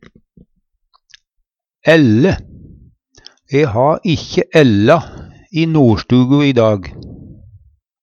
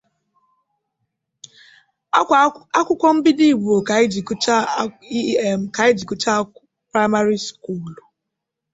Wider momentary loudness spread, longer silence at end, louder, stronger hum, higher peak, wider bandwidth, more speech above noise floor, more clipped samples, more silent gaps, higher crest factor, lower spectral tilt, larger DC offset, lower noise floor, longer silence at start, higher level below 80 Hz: about the same, 12 LU vs 10 LU; about the same, 0.7 s vs 0.8 s; first, -13 LUFS vs -18 LUFS; neither; about the same, 0 dBFS vs -2 dBFS; about the same, 8.6 kHz vs 8 kHz; second, 58 dB vs 63 dB; neither; neither; about the same, 14 dB vs 18 dB; first, -7 dB/octave vs -4.5 dB/octave; neither; second, -70 dBFS vs -81 dBFS; second, 1.85 s vs 2.15 s; first, -42 dBFS vs -60 dBFS